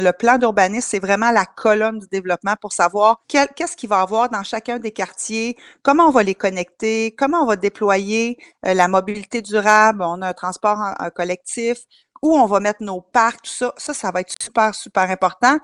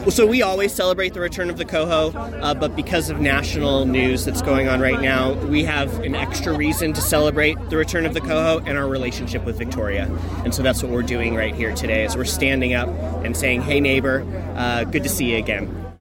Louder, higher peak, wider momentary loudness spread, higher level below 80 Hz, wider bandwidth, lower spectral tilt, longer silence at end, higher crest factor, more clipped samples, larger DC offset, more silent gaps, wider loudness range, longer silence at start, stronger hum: about the same, -18 LUFS vs -20 LUFS; first, 0 dBFS vs -4 dBFS; first, 10 LU vs 7 LU; second, -58 dBFS vs -32 dBFS; second, 11.5 kHz vs 17 kHz; about the same, -4 dB/octave vs -4.5 dB/octave; about the same, 0.05 s vs 0.05 s; about the same, 18 dB vs 16 dB; neither; neither; neither; about the same, 2 LU vs 3 LU; about the same, 0 s vs 0 s; neither